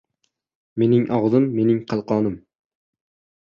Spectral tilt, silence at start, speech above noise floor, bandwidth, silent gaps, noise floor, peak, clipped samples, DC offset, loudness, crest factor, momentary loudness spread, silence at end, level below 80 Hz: -9.5 dB/octave; 0.75 s; 54 dB; 6.8 kHz; none; -73 dBFS; -4 dBFS; under 0.1%; under 0.1%; -20 LUFS; 18 dB; 9 LU; 1.05 s; -58 dBFS